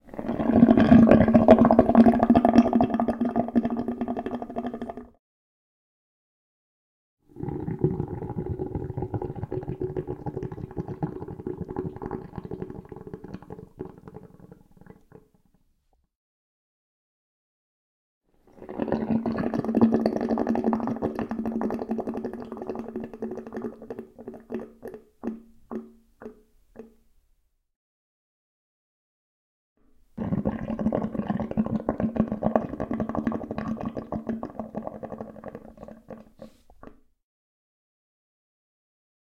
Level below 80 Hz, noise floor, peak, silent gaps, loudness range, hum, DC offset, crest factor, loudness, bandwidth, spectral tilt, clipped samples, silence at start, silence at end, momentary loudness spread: -50 dBFS; -69 dBFS; -2 dBFS; 5.19-7.17 s, 16.15-18.21 s, 27.76-29.76 s; 21 LU; none; under 0.1%; 24 dB; -25 LUFS; 6 kHz; -9.5 dB/octave; under 0.1%; 0.05 s; 2.35 s; 24 LU